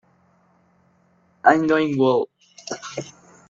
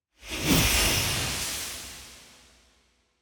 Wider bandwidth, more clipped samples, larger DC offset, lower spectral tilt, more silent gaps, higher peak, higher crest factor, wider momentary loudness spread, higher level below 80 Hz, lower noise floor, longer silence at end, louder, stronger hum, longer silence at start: second, 7.6 kHz vs over 20 kHz; neither; neither; first, -5.5 dB/octave vs -2.5 dB/octave; neither; first, -2 dBFS vs -8 dBFS; about the same, 22 dB vs 20 dB; about the same, 18 LU vs 20 LU; second, -66 dBFS vs -40 dBFS; second, -60 dBFS vs -67 dBFS; second, 0.4 s vs 0.95 s; first, -20 LUFS vs -25 LUFS; neither; first, 1.45 s vs 0.2 s